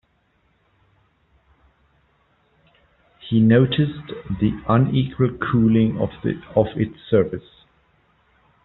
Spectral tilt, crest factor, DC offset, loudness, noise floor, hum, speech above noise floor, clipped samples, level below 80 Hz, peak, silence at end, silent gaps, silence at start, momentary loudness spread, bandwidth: -7 dB/octave; 20 dB; under 0.1%; -20 LUFS; -64 dBFS; none; 45 dB; under 0.1%; -48 dBFS; -2 dBFS; 1.25 s; none; 3.25 s; 11 LU; 4.1 kHz